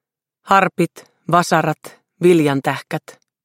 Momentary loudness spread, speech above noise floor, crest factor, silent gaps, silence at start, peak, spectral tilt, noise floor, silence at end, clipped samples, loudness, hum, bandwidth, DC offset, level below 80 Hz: 14 LU; 29 dB; 18 dB; none; 0.45 s; 0 dBFS; -6 dB/octave; -46 dBFS; 0.45 s; under 0.1%; -17 LUFS; none; 16.5 kHz; under 0.1%; -60 dBFS